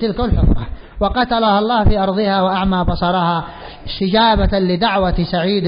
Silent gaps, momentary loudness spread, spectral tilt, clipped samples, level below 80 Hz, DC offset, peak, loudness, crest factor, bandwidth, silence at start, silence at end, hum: none; 9 LU; -11.5 dB/octave; under 0.1%; -24 dBFS; under 0.1%; -4 dBFS; -16 LUFS; 12 dB; 5.4 kHz; 0 s; 0 s; none